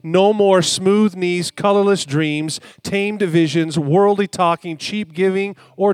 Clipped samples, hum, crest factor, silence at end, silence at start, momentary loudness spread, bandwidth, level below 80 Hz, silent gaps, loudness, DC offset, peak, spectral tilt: under 0.1%; none; 16 dB; 0 s; 0.05 s; 10 LU; 14 kHz; -64 dBFS; none; -17 LUFS; under 0.1%; -2 dBFS; -5 dB/octave